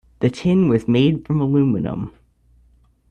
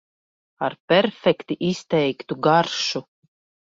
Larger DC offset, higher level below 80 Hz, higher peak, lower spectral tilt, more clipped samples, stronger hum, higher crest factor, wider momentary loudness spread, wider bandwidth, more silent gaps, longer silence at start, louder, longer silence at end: neither; first, -48 dBFS vs -64 dBFS; about the same, -4 dBFS vs -4 dBFS; first, -8.5 dB/octave vs -5 dB/octave; neither; neither; about the same, 14 dB vs 18 dB; about the same, 10 LU vs 10 LU; first, 9.4 kHz vs 7.8 kHz; second, none vs 0.80-0.88 s; second, 0.2 s vs 0.6 s; first, -18 LUFS vs -22 LUFS; first, 1 s vs 0.65 s